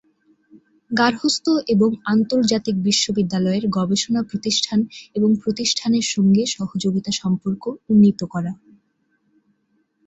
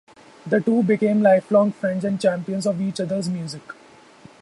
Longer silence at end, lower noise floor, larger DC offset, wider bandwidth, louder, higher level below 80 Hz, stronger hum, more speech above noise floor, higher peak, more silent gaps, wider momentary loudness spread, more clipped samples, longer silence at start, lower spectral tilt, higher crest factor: first, 1.5 s vs 0.7 s; first, -67 dBFS vs -48 dBFS; neither; second, 8.2 kHz vs 11.5 kHz; about the same, -19 LUFS vs -21 LUFS; first, -58 dBFS vs -66 dBFS; neither; first, 48 dB vs 27 dB; about the same, -2 dBFS vs -4 dBFS; neither; second, 9 LU vs 15 LU; neither; about the same, 0.55 s vs 0.45 s; second, -4.5 dB/octave vs -7 dB/octave; about the same, 18 dB vs 18 dB